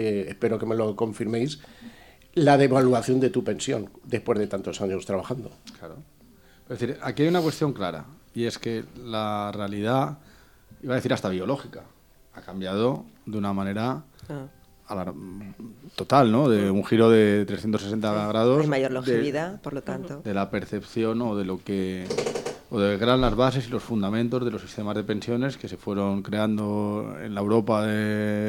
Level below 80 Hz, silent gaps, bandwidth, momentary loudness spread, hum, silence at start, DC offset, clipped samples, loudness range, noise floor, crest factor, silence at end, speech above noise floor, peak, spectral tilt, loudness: -50 dBFS; none; 19 kHz; 16 LU; none; 0 s; under 0.1%; under 0.1%; 8 LU; -55 dBFS; 22 dB; 0 s; 30 dB; -4 dBFS; -6.5 dB/octave; -25 LUFS